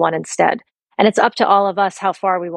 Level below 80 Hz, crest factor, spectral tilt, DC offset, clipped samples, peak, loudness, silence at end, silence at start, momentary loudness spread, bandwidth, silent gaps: -68 dBFS; 16 dB; -4 dB/octave; under 0.1%; under 0.1%; 0 dBFS; -16 LUFS; 0 s; 0 s; 6 LU; 11.5 kHz; none